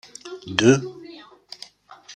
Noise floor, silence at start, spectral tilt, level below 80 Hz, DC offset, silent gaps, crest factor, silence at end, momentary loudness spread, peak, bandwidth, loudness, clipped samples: -47 dBFS; 0.25 s; -5 dB/octave; -62 dBFS; under 0.1%; none; 22 dB; 0 s; 25 LU; -2 dBFS; 10 kHz; -19 LUFS; under 0.1%